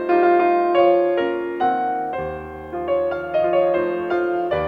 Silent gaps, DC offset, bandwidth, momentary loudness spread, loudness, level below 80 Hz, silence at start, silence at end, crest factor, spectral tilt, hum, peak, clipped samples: none; under 0.1%; 4.9 kHz; 11 LU; -20 LUFS; -50 dBFS; 0 s; 0 s; 14 dB; -8 dB/octave; none; -4 dBFS; under 0.1%